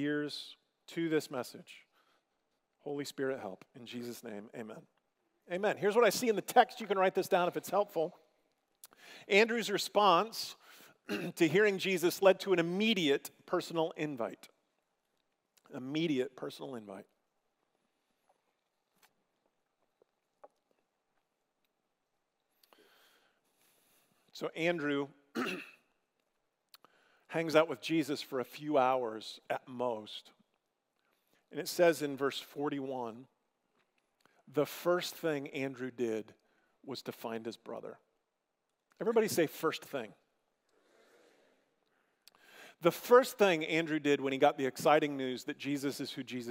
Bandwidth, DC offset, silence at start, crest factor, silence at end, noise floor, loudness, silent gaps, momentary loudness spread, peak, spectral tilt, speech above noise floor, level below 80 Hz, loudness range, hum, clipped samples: 16 kHz; under 0.1%; 0 s; 26 dB; 0 s; -84 dBFS; -33 LUFS; none; 18 LU; -10 dBFS; -4.5 dB/octave; 51 dB; under -90 dBFS; 11 LU; none; under 0.1%